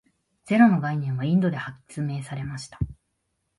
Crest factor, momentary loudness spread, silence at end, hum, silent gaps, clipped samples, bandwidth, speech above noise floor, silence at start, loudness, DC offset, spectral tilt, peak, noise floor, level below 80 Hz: 20 dB; 15 LU; 0.65 s; none; none; under 0.1%; 11.5 kHz; 52 dB; 0.45 s; -25 LUFS; under 0.1%; -7.5 dB/octave; -4 dBFS; -76 dBFS; -48 dBFS